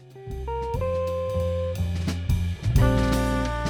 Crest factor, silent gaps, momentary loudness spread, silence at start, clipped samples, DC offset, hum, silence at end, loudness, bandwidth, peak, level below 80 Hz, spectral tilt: 18 dB; none; 9 LU; 0 s; under 0.1%; under 0.1%; none; 0 s; -26 LUFS; 18.5 kHz; -8 dBFS; -30 dBFS; -7 dB/octave